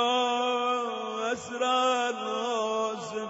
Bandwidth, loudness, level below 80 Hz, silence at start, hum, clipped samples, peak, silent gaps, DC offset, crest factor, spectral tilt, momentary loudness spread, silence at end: 8 kHz; -28 LUFS; -76 dBFS; 0 s; none; under 0.1%; -14 dBFS; none; under 0.1%; 14 dB; -2.5 dB/octave; 7 LU; 0 s